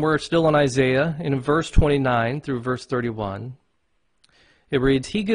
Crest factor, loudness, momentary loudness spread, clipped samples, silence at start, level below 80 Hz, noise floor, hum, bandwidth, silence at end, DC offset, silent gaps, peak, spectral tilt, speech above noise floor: 16 dB; -22 LUFS; 9 LU; under 0.1%; 0 s; -34 dBFS; -71 dBFS; none; 10.5 kHz; 0 s; under 0.1%; none; -6 dBFS; -6.5 dB/octave; 51 dB